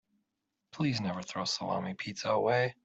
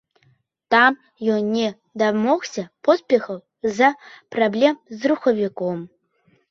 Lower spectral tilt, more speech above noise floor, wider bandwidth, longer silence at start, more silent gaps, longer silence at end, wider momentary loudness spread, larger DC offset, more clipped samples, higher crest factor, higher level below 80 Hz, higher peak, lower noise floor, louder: about the same, -5 dB/octave vs -5 dB/octave; first, 52 dB vs 42 dB; first, 8.2 kHz vs 7.4 kHz; about the same, 0.75 s vs 0.7 s; neither; second, 0.15 s vs 0.65 s; about the same, 8 LU vs 10 LU; neither; neither; about the same, 18 dB vs 20 dB; second, -72 dBFS vs -66 dBFS; second, -16 dBFS vs -2 dBFS; first, -85 dBFS vs -62 dBFS; second, -33 LUFS vs -20 LUFS